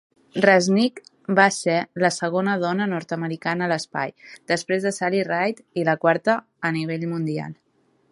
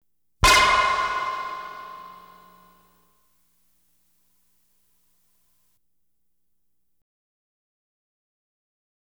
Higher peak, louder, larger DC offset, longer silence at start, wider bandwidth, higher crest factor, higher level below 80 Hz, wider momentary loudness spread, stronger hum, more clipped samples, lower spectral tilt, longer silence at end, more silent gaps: first, -2 dBFS vs -6 dBFS; second, -22 LUFS vs -19 LUFS; neither; about the same, 0.35 s vs 0.4 s; second, 11.5 kHz vs over 20 kHz; about the same, 22 dB vs 24 dB; second, -70 dBFS vs -44 dBFS; second, 11 LU vs 25 LU; second, none vs 60 Hz at -75 dBFS; neither; first, -5 dB/octave vs -1.5 dB/octave; second, 0.6 s vs 6.85 s; neither